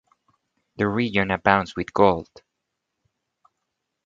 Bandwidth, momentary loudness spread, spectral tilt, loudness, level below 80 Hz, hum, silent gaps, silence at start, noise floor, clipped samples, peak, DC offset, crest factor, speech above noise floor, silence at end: 7.6 kHz; 8 LU; -7 dB/octave; -22 LUFS; -52 dBFS; none; none; 0.8 s; -80 dBFS; under 0.1%; 0 dBFS; under 0.1%; 24 dB; 59 dB; 1.8 s